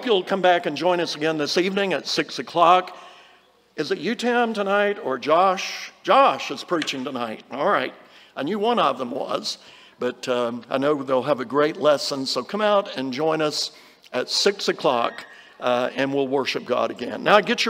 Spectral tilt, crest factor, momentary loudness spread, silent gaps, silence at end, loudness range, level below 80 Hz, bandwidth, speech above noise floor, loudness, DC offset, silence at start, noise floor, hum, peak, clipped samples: -3.5 dB/octave; 20 dB; 11 LU; none; 0 s; 4 LU; -74 dBFS; 16 kHz; 34 dB; -22 LUFS; under 0.1%; 0 s; -56 dBFS; none; -2 dBFS; under 0.1%